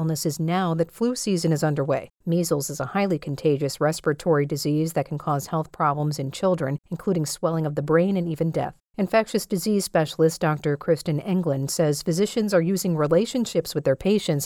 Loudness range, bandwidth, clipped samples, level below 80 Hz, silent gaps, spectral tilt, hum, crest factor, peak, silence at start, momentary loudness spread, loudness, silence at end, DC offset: 2 LU; 17.5 kHz; under 0.1%; -56 dBFS; none; -6 dB/octave; none; 14 dB; -8 dBFS; 0 s; 5 LU; -24 LUFS; 0 s; under 0.1%